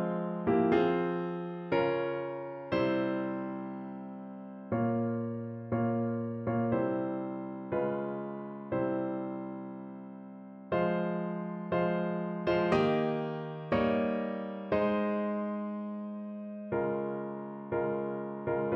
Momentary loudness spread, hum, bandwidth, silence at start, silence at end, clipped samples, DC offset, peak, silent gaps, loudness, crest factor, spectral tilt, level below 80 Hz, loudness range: 12 LU; none; 7 kHz; 0 s; 0 s; under 0.1%; under 0.1%; -14 dBFS; none; -33 LUFS; 18 dB; -9 dB/octave; -64 dBFS; 5 LU